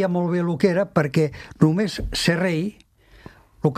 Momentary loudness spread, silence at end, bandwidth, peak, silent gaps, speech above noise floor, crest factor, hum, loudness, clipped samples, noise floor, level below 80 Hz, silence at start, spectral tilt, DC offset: 6 LU; 0 s; 14.5 kHz; -2 dBFS; none; 26 dB; 20 dB; none; -22 LUFS; under 0.1%; -47 dBFS; -42 dBFS; 0 s; -6.5 dB/octave; under 0.1%